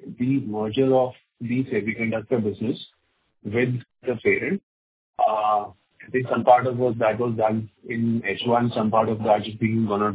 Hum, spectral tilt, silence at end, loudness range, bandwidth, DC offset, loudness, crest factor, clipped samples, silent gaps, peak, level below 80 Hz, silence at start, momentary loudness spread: none; -10.5 dB/octave; 0 s; 4 LU; 4 kHz; under 0.1%; -23 LUFS; 20 dB; under 0.1%; 4.63-5.13 s; -2 dBFS; -58 dBFS; 0 s; 10 LU